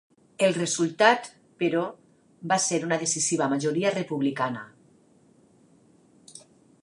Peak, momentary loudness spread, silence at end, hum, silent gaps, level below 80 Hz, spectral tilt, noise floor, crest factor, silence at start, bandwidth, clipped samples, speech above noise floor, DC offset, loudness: -4 dBFS; 10 LU; 0.45 s; none; none; -78 dBFS; -3.5 dB/octave; -59 dBFS; 22 dB; 0.4 s; 11.5 kHz; under 0.1%; 34 dB; under 0.1%; -25 LUFS